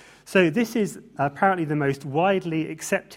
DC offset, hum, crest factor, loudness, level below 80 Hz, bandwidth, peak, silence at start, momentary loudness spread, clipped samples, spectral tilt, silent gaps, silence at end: under 0.1%; none; 18 dB; -24 LUFS; -64 dBFS; 16 kHz; -4 dBFS; 0.25 s; 7 LU; under 0.1%; -5.5 dB/octave; none; 0 s